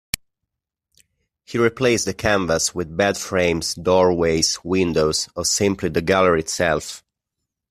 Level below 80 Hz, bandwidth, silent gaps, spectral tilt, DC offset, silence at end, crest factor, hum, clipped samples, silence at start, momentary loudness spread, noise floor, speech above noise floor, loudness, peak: -48 dBFS; 15.5 kHz; none; -3.5 dB/octave; under 0.1%; 0.75 s; 18 dB; none; under 0.1%; 1.5 s; 6 LU; -82 dBFS; 62 dB; -19 LUFS; -2 dBFS